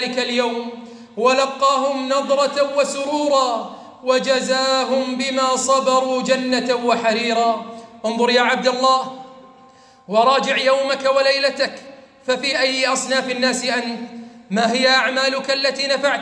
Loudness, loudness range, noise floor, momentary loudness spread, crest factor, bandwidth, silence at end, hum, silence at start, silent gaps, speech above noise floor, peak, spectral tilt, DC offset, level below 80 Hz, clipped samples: -18 LUFS; 1 LU; -48 dBFS; 12 LU; 16 dB; 10.5 kHz; 0 s; none; 0 s; none; 30 dB; -4 dBFS; -2.5 dB/octave; under 0.1%; -72 dBFS; under 0.1%